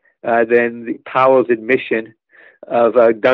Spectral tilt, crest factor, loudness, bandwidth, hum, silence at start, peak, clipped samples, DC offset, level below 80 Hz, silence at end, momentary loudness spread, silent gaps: -3.5 dB/octave; 14 dB; -15 LUFS; 5.4 kHz; none; 0.25 s; -2 dBFS; under 0.1%; under 0.1%; -66 dBFS; 0 s; 9 LU; none